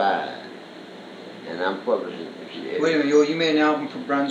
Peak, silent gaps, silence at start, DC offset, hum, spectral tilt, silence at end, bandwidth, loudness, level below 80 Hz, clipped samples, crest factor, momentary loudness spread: -6 dBFS; none; 0 s; under 0.1%; none; -5 dB/octave; 0 s; 8.6 kHz; -22 LUFS; -82 dBFS; under 0.1%; 18 dB; 21 LU